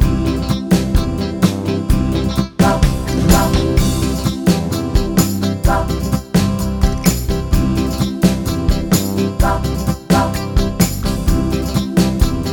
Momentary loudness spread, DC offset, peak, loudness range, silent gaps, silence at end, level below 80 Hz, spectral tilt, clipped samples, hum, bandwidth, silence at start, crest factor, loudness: 4 LU; under 0.1%; 0 dBFS; 1 LU; none; 0 s; -20 dBFS; -6 dB/octave; under 0.1%; none; over 20 kHz; 0 s; 14 dB; -16 LUFS